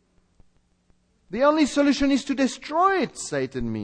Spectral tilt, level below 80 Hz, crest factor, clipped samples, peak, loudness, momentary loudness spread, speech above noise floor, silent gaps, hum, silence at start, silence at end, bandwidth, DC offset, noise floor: -4.5 dB/octave; -48 dBFS; 18 dB; under 0.1%; -6 dBFS; -22 LUFS; 8 LU; 41 dB; none; none; 1.3 s; 0 s; 10 kHz; under 0.1%; -63 dBFS